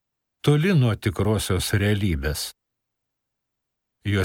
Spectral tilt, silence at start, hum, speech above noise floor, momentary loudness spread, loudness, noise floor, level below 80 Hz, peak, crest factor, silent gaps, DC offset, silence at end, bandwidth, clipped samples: -5.5 dB/octave; 0.45 s; none; 59 dB; 10 LU; -23 LUFS; -80 dBFS; -42 dBFS; -6 dBFS; 18 dB; none; under 0.1%; 0 s; 17 kHz; under 0.1%